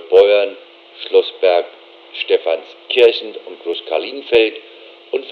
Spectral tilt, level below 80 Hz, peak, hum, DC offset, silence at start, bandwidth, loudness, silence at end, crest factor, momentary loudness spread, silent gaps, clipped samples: -4 dB/octave; -64 dBFS; 0 dBFS; none; under 0.1%; 0 s; 5.2 kHz; -16 LUFS; 0 s; 16 dB; 17 LU; none; under 0.1%